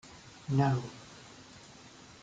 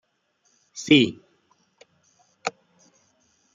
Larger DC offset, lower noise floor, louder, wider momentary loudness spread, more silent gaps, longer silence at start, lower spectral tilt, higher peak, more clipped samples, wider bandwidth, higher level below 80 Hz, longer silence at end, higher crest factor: neither; second, -54 dBFS vs -69 dBFS; second, -31 LUFS vs -22 LUFS; first, 23 LU vs 19 LU; neither; second, 0.05 s vs 0.75 s; first, -7 dB/octave vs -4.5 dB/octave; second, -14 dBFS vs -4 dBFS; neither; first, 8.8 kHz vs 7.6 kHz; first, -64 dBFS vs -70 dBFS; second, 0.1 s vs 1.05 s; about the same, 22 dB vs 24 dB